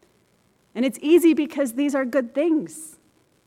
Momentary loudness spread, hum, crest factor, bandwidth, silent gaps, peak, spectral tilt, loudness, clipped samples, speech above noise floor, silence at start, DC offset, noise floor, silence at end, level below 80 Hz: 20 LU; none; 16 dB; 15.5 kHz; none; -6 dBFS; -4.5 dB/octave; -21 LUFS; under 0.1%; 42 dB; 0.75 s; under 0.1%; -63 dBFS; 0.55 s; -72 dBFS